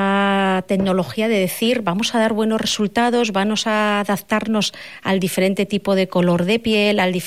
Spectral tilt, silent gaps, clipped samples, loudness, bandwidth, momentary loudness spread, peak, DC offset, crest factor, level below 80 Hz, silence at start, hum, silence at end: -5 dB/octave; none; under 0.1%; -18 LUFS; 16 kHz; 4 LU; -6 dBFS; 0.4%; 12 dB; -54 dBFS; 0 s; none; 0 s